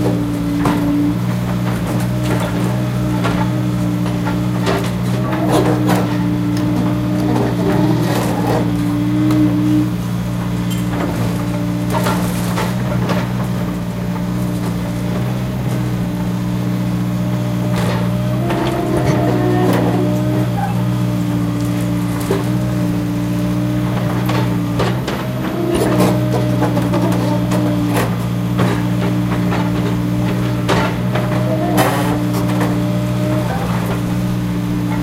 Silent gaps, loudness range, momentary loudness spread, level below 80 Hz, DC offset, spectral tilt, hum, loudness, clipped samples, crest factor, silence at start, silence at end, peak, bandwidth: none; 3 LU; 5 LU; -34 dBFS; under 0.1%; -7 dB/octave; none; -17 LUFS; under 0.1%; 16 dB; 0 s; 0 s; 0 dBFS; 16 kHz